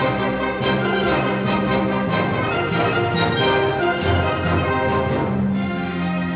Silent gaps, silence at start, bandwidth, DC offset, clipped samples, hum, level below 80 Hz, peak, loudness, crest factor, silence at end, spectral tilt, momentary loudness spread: none; 0 s; 4 kHz; under 0.1%; under 0.1%; none; -36 dBFS; -8 dBFS; -20 LUFS; 12 dB; 0 s; -10 dB/octave; 4 LU